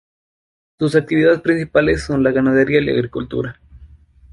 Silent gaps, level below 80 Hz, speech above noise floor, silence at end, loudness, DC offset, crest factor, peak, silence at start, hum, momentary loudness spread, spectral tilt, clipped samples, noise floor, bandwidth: none; -40 dBFS; 28 dB; 0.45 s; -17 LUFS; under 0.1%; 16 dB; -2 dBFS; 0.8 s; none; 9 LU; -7 dB/octave; under 0.1%; -44 dBFS; 11.5 kHz